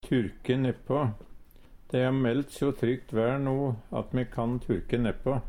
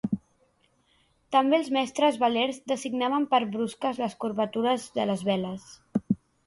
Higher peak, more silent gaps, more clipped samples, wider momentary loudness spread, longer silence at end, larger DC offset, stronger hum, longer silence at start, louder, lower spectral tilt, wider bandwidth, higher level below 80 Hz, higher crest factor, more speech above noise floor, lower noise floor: about the same, -12 dBFS vs -10 dBFS; neither; neither; second, 5 LU vs 9 LU; second, 0 s vs 0.3 s; neither; neither; about the same, 0.05 s vs 0.05 s; about the same, -29 LUFS vs -27 LUFS; first, -8 dB/octave vs -5 dB/octave; first, 15.5 kHz vs 11.5 kHz; first, -46 dBFS vs -66 dBFS; about the same, 16 dB vs 18 dB; second, 22 dB vs 41 dB; second, -50 dBFS vs -67 dBFS